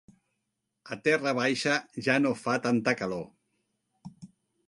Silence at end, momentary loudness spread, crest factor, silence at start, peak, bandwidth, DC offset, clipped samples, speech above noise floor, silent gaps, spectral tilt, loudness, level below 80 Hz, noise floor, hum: 0.4 s; 17 LU; 22 dB; 0.85 s; -10 dBFS; 11.5 kHz; under 0.1%; under 0.1%; 54 dB; none; -4.5 dB/octave; -28 LUFS; -72 dBFS; -82 dBFS; none